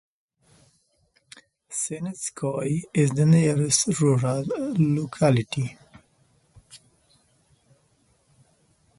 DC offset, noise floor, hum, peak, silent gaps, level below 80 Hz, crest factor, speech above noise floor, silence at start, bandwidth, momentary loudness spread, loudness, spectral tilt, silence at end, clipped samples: under 0.1%; -67 dBFS; none; -6 dBFS; none; -60 dBFS; 20 dB; 44 dB; 1.7 s; 11.5 kHz; 11 LU; -23 LUFS; -5.5 dB/octave; 2.2 s; under 0.1%